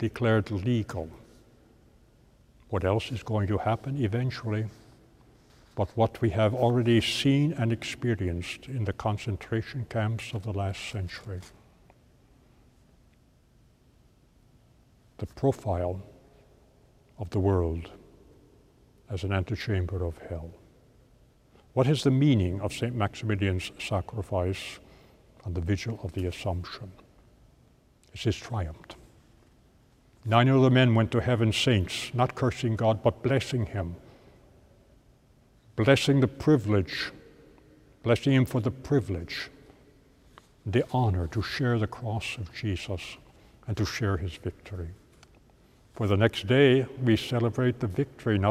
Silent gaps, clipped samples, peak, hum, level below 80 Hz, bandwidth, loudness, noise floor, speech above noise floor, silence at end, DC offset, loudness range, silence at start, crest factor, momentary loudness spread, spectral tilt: none; under 0.1%; -4 dBFS; none; -50 dBFS; 14.5 kHz; -28 LUFS; -61 dBFS; 34 dB; 0 s; under 0.1%; 9 LU; 0 s; 24 dB; 16 LU; -6.5 dB/octave